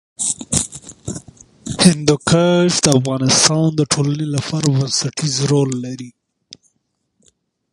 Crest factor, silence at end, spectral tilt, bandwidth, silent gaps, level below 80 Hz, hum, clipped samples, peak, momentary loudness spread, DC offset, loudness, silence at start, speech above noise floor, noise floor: 18 dB; 1.65 s; -4 dB/octave; 15.5 kHz; none; -46 dBFS; none; under 0.1%; 0 dBFS; 18 LU; under 0.1%; -15 LUFS; 0.2 s; 54 dB; -69 dBFS